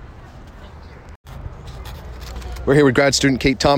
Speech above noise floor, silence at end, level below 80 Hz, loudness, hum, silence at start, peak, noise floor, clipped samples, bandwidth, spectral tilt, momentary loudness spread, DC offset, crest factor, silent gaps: 24 dB; 0 s; -34 dBFS; -16 LUFS; none; 0 s; -4 dBFS; -39 dBFS; under 0.1%; 16.5 kHz; -4.5 dB/octave; 26 LU; under 0.1%; 16 dB; 1.16-1.24 s